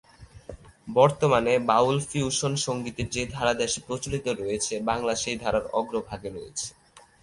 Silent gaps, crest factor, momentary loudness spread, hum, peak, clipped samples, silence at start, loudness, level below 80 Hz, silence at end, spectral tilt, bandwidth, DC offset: none; 22 dB; 14 LU; none; -4 dBFS; under 0.1%; 0.2 s; -26 LUFS; -50 dBFS; 0.25 s; -4 dB/octave; 11.5 kHz; under 0.1%